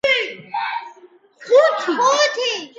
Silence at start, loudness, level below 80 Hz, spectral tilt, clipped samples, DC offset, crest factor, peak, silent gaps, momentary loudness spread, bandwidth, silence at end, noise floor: 0.05 s; -18 LUFS; -68 dBFS; -1 dB/octave; under 0.1%; under 0.1%; 18 dB; -2 dBFS; none; 11 LU; 7.8 kHz; 0.1 s; -48 dBFS